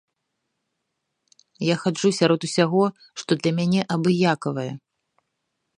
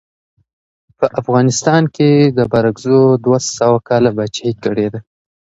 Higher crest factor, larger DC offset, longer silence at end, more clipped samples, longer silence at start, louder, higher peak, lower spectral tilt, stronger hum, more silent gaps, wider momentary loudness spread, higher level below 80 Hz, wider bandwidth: first, 20 dB vs 14 dB; neither; first, 1 s vs 0.55 s; neither; first, 1.6 s vs 1 s; second, -22 LUFS vs -14 LUFS; second, -4 dBFS vs 0 dBFS; about the same, -5.5 dB/octave vs -6 dB/octave; neither; neither; about the same, 10 LU vs 8 LU; second, -68 dBFS vs -50 dBFS; first, 11 kHz vs 8 kHz